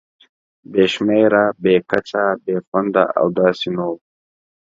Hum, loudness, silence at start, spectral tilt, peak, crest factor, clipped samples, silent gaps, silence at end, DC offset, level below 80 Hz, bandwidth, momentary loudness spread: none; -17 LUFS; 0.7 s; -6.5 dB/octave; 0 dBFS; 18 dB; under 0.1%; 2.67-2.72 s; 0.7 s; under 0.1%; -58 dBFS; 7.8 kHz; 8 LU